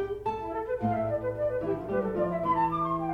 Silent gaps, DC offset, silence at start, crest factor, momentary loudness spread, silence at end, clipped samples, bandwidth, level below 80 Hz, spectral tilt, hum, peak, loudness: none; under 0.1%; 0 s; 12 dB; 6 LU; 0 s; under 0.1%; 13.5 kHz; -52 dBFS; -9 dB/octave; none; -16 dBFS; -30 LUFS